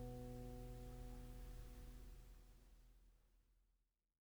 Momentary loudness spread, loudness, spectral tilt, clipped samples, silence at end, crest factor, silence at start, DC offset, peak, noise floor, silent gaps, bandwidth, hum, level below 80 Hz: 12 LU; -58 LUFS; -6.5 dB/octave; under 0.1%; 0.55 s; 14 dB; 0 s; under 0.1%; -42 dBFS; -86 dBFS; none; over 20 kHz; none; -58 dBFS